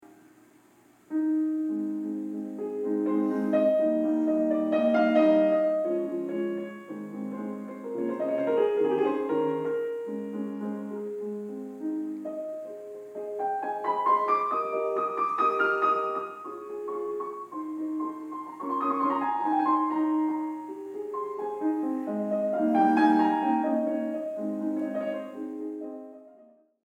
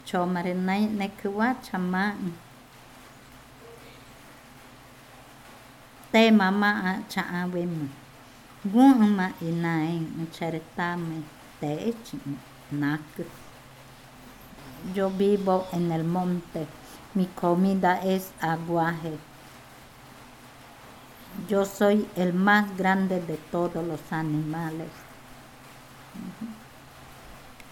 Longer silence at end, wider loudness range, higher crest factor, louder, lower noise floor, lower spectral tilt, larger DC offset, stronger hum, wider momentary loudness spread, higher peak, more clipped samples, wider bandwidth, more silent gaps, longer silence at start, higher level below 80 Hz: first, 0.45 s vs 0 s; about the same, 7 LU vs 9 LU; about the same, 18 dB vs 22 dB; about the same, -28 LUFS vs -26 LUFS; first, -59 dBFS vs -50 dBFS; about the same, -7.5 dB/octave vs -6.5 dB/octave; neither; neither; second, 13 LU vs 26 LU; second, -10 dBFS vs -6 dBFS; neither; second, 8.6 kHz vs 17.5 kHz; neither; about the same, 0 s vs 0.05 s; second, -86 dBFS vs -60 dBFS